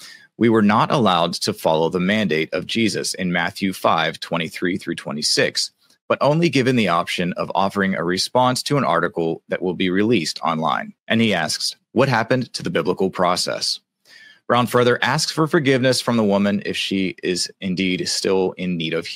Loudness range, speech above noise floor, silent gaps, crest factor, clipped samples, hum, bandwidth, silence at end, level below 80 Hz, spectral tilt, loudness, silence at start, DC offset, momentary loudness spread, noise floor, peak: 2 LU; 29 dB; 6.01-6.08 s, 11.00-11.06 s; 18 dB; under 0.1%; none; 16 kHz; 0 s; -62 dBFS; -4.5 dB/octave; -20 LUFS; 0 s; under 0.1%; 7 LU; -48 dBFS; -2 dBFS